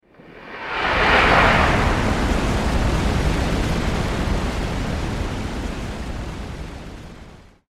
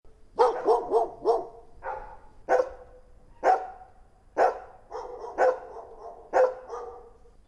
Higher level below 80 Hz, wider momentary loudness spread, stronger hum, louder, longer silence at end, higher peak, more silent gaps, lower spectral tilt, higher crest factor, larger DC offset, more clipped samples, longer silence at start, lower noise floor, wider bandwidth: first, -26 dBFS vs -56 dBFS; about the same, 20 LU vs 19 LU; neither; first, -20 LUFS vs -27 LUFS; second, 0.25 s vs 0.4 s; first, -2 dBFS vs -8 dBFS; neither; about the same, -5.5 dB/octave vs -4.5 dB/octave; about the same, 20 dB vs 20 dB; neither; neither; first, 0.25 s vs 0.05 s; second, -43 dBFS vs -55 dBFS; first, 14.5 kHz vs 11 kHz